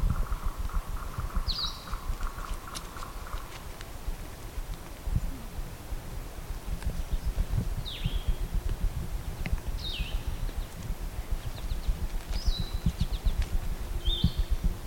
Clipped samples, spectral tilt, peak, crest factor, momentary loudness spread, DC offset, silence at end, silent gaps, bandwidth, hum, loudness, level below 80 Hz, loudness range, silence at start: under 0.1%; -5 dB/octave; -12 dBFS; 18 dB; 9 LU; under 0.1%; 0 s; none; 17 kHz; none; -36 LUFS; -32 dBFS; 6 LU; 0 s